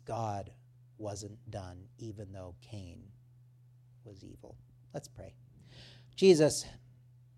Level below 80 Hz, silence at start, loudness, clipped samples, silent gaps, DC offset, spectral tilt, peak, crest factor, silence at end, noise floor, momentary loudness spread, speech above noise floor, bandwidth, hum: -64 dBFS; 0.05 s; -31 LUFS; under 0.1%; none; under 0.1%; -5 dB/octave; -12 dBFS; 24 dB; 0.6 s; -60 dBFS; 28 LU; 27 dB; 13.5 kHz; none